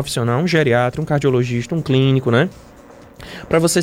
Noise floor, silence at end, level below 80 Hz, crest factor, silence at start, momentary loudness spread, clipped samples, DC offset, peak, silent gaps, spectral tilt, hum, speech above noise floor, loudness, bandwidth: -42 dBFS; 0 s; -46 dBFS; 14 dB; 0 s; 7 LU; under 0.1%; under 0.1%; -2 dBFS; none; -5.5 dB/octave; none; 25 dB; -17 LUFS; 16 kHz